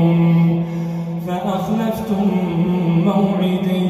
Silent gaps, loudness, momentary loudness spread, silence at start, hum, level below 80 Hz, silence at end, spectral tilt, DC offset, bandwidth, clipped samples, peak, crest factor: none; -18 LUFS; 9 LU; 0 s; none; -48 dBFS; 0 s; -8.5 dB/octave; under 0.1%; 13 kHz; under 0.1%; -4 dBFS; 12 dB